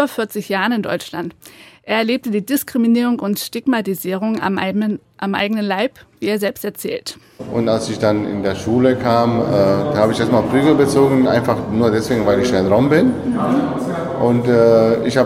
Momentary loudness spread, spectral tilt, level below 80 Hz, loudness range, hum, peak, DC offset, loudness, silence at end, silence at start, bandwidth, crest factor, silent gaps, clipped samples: 10 LU; -6 dB/octave; -48 dBFS; 6 LU; none; -2 dBFS; under 0.1%; -17 LUFS; 0 s; 0 s; 16.5 kHz; 14 dB; none; under 0.1%